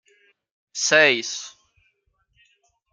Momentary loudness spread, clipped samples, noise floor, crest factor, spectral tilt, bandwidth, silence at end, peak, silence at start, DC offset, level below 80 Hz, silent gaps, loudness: 20 LU; under 0.1%; -69 dBFS; 24 dB; -1 dB/octave; 10 kHz; 1.45 s; -2 dBFS; 0.75 s; under 0.1%; -76 dBFS; none; -19 LUFS